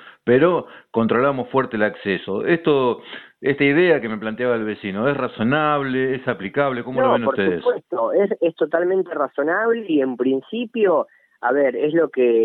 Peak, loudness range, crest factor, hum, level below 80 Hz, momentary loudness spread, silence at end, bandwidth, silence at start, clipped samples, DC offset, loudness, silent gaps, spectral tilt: -4 dBFS; 1 LU; 16 dB; none; -58 dBFS; 7 LU; 0 s; 4.4 kHz; 0.05 s; under 0.1%; under 0.1%; -20 LUFS; none; -9.5 dB/octave